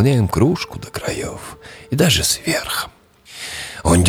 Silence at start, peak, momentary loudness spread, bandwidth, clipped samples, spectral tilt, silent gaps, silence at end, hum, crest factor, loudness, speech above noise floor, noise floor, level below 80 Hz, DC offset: 0 s; -4 dBFS; 18 LU; 18.5 kHz; under 0.1%; -4.5 dB/octave; none; 0 s; none; 16 dB; -19 LUFS; 19 dB; -37 dBFS; -36 dBFS; under 0.1%